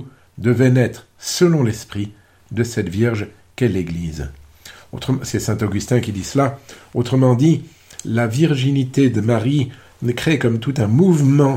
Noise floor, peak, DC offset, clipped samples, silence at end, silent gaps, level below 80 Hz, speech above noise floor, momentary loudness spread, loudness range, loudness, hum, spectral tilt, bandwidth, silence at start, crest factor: -42 dBFS; -2 dBFS; under 0.1%; under 0.1%; 0 s; none; -44 dBFS; 25 dB; 14 LU; 5 LU; -18 LUFS; none; -6.5 dB/octave; 16 kHz; 0 s; 16 dB